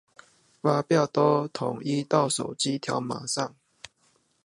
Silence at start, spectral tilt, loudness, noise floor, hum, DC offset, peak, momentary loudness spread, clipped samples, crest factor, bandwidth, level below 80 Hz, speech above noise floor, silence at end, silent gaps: 0.65 s; -5 dB/octave; -26 LUFS; -67 dBFS; none; under 0.1%; -6 dBFS; 8 LU; under 0.1%; 22 dB; 11.5 kHz; -72 dBFS; 42 dB; 1 s; none